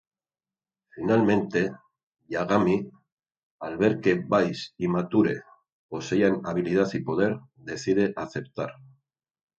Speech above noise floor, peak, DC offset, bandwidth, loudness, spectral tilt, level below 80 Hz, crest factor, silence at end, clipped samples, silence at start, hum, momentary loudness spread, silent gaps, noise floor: over 65 dB; -6 dBFS; under 0.1%; 8 kHz; -26 LUFS; -7 dB/octave; -60 dBFS; 20 dB; 0.9 s; under 0.1%; 0.95 s; none; 13 LU; 2.03-2.12 s, 3.12-3.17 s, 3.43-3.59 s, 5.72-5.89 s; under -90 dBFS